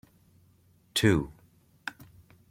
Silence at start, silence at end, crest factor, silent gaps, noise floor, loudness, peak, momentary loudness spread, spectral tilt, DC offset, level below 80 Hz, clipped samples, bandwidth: 0.95 s; 0.6 s; 24 dB; none; -63 dBFS; -28 LUFS; -8 dBFS; 17 LU; -5 dB/octave; under 0.1%; -54 dBFS; under 0.1%; 16.5 kHz